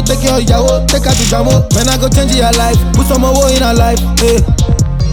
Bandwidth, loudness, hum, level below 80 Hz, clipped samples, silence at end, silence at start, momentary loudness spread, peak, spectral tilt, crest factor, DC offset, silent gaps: 19.5 kHz; -10 LUFS; none; -14 dBFS; under 0.1%; 0 s; 0 s; 2 LU; 0 dBFS; -4.5 dB/octave; 8 dB; under 0.1%; none